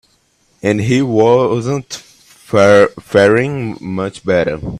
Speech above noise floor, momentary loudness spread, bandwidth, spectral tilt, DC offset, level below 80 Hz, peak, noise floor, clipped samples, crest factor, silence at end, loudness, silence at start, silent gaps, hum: 44 dB; 13 LU; 13 kHz; -6 dB/octave; under 0.1%; -46 dBFS; 0 dBFS; -57 dBFS; under 0.1%; 14 dB; 0 s; -13 LUFS; 0.65 s; none; none